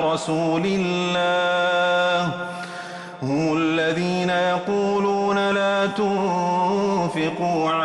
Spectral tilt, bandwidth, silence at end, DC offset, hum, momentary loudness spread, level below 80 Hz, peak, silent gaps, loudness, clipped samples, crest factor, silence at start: -5.5 dB/octave; 11.5 kHz; 0 s; under 0.1%; none; 6 LU; -62 dBFS; -10 dBFS; none; -21 LUFS; under 0.1%; 10 dB; 0 s